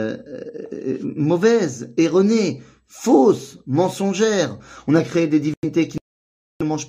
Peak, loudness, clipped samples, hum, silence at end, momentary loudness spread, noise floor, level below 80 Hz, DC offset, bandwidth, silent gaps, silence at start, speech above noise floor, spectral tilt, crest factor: -2 dBFS; -19 LUFS; under 0.1%; none; 0 s; 15 LU; under -90 dBFS; -58 dBFS; under 0.1%; 15.5 kHz; 5.57-5.62 s, 6.01-6.60 s; 0 s; over 71 dB; -6 dB/octave; 18 dB